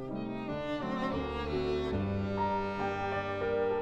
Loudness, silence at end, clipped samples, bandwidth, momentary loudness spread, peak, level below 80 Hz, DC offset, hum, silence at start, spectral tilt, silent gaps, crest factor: -34 LUFS; 0 s; under 0.1%; 8.8 kHz; 4 LU; -20 dBFS; -48 dBFS; under 0.1%; none; 0 s; -7.5 dB/octave; none; 12 dB